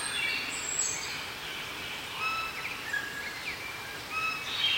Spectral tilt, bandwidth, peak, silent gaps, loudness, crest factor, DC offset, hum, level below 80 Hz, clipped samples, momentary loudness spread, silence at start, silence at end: 0 dB/octave; 16.5 kHz; -18 dBFS; none; -32 LUFS; 16 dB; under 0.1%; none; -62 dBFS; under 0.1%; 7 LU; 0 s; 0 s